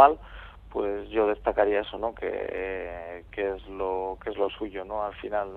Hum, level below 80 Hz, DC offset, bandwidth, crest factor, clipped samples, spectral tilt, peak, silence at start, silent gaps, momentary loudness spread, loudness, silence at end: none; -48 dBFS; under 0.1%; 4.4 kHz; 24 dB; under 0.1%; -7.5 dB/octave; -2 dBFS; 0 s; none; 11 LU; -29 LUFS; 0 s